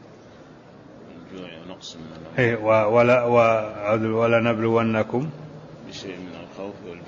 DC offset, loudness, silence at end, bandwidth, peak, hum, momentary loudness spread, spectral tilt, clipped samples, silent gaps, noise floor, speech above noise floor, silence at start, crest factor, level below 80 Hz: under 0.1%; -20 LUFS; 0 s; 7.4 kHz; -6 dBFS; none; 21 LU; -7 dB/octave; under 0.1%; none; -46 dBFS; 24 dB; 0.1 s; 18 dB; -60 dBFS